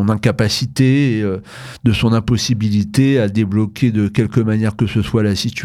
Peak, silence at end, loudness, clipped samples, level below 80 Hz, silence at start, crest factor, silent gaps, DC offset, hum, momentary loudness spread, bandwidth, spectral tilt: -2 dBFS; 0 s; -16 LUFS; under 0.1%; -40 dBFS; 0 s; 14 dB; none; under 0.1%; none; 4 LU; 14 kHz; -6.5 dB/octave